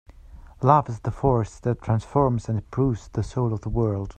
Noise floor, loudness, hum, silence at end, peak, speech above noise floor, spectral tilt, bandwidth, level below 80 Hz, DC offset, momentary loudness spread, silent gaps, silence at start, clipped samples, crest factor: -45 dBFS; -24 LUFS; none; 0.05 s; -2 dBFS; 22 dB; -9 dB/octave; 8.8 kHz; -40 dBFS; under 0.1%; 9 LU; none; 0.25 s; under 0.1%; 22 dB